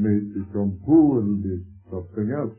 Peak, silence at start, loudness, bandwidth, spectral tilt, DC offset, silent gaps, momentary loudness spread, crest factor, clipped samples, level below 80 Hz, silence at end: -6 dBFS; 0 s; -22 LUFS; 2.3 kHz; -15.5 dB/octave; under 0.1%; none; 17 LU; 16 dB; under 0.1%; -52 dBFS; 0.05 s